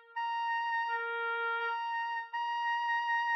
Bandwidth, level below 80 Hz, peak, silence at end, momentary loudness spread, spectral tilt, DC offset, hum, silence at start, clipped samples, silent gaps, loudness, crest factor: 6 kHz; under -90 dBFS; -24 dBFS; 0 s; 5 LU; 3.5 dB/octave; under 0.1%; none; 0.1 s; under 0.1%; none; -33 LUFS; 10 dB